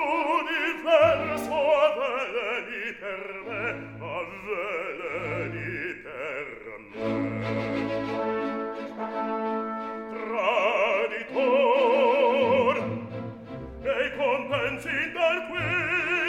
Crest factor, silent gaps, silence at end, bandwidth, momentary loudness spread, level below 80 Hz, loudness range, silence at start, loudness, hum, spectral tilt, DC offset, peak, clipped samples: 18 dB; none; 0 s; 17.5 kHz; 13 LU; -58 dBFS; 9 LU; 0 s; -26 LUFS; none; -5.5 dB/octave; under 0.1%; -8 dBFS; under 0.1%